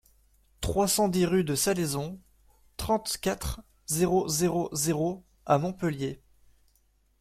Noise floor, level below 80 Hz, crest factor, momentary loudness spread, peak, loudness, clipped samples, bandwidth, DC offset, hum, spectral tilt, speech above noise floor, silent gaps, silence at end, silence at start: -67 dBFS; -48 dBFS; 20 dB; 14 LU; -10 dBFS; -28 LUFS; under 0.1%; 16 kHz; under 0.1%; none; -4.5 dB/octave; 40 dB; none; 1.05 s; 0.6 s